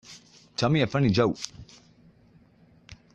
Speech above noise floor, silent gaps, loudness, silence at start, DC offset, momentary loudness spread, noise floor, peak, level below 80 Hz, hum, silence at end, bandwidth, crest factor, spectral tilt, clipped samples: 34 dB; none; -25 LUFS; 0.1 s; under 0.1%; 21 LU; -58 dBFS; -8 dBFS; -56 dBFS; none; 0.2 s; 9.4 kHz; 20 dB; -6 dB/octave; under 0.1%